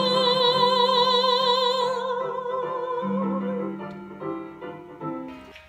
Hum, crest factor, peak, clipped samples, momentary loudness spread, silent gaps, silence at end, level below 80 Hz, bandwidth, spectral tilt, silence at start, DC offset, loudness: none; 18 dB; -8 dBFS; under 0.1%; 17 LU; none; 0.05 s; -68 dBFS; 13 kHz; -4.5 dB/octave; 0 s; under 0.1%; -23 LUFS